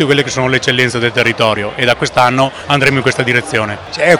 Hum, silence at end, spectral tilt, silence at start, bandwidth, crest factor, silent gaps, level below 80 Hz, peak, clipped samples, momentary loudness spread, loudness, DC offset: none; 0 s; -4.5 dB/octave; 0 s; over 20 kHz; 12 dB; none; -44 dBFS; 0 dBFS; 0.7%; 4 LU; -12 LUFS; 0.2%